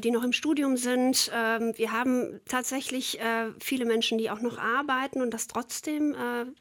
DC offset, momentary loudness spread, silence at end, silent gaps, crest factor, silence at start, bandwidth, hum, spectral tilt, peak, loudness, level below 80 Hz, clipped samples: under 0.1%; 7 LU; 0.05 s; none; 18 dB; 0 s; 17.5 kHz; none; -2 dB/octave; -10 dBFS; -28 LUFS; -72 dBFS; under 0.1%